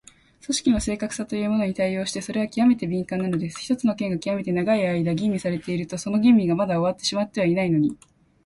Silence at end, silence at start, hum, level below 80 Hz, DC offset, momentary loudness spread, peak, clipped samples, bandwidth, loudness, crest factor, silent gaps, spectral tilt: 0.5 s; 0.5 s; none; -50 dBFS; under 0.1%; 7 LU; -8 dBFS; under 0.1%; 11.5 kHz; -23 LUFS; 16 dB; none; -5.5 dB/octave